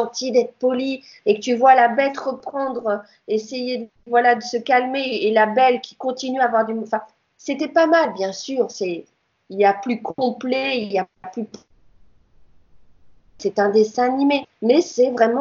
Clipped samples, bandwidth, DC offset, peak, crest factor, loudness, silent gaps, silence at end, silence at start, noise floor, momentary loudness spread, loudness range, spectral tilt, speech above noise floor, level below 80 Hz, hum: under 0.1%; 7.4 kHz; under 0.1%; -2 dBFS; 18 dB; -20 LUFS; none; 0 s; 0 s; -52 dBFS; 11 LU; 6 LU; -4 dB/octave; 32 dB; -66 dBFS; none